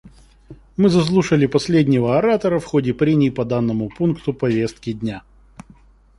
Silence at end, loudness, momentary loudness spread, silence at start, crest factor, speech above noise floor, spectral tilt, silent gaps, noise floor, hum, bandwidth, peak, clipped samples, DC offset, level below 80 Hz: 1 s; -18 LUFS; 10 LU; 0.05 s; 16 dB; 31 dB; -7 dB/octave; none; -49 dBFS; none; 11.5 kHz; -4 dBFS; under 0.1%; under 0.1%; -46 dBFS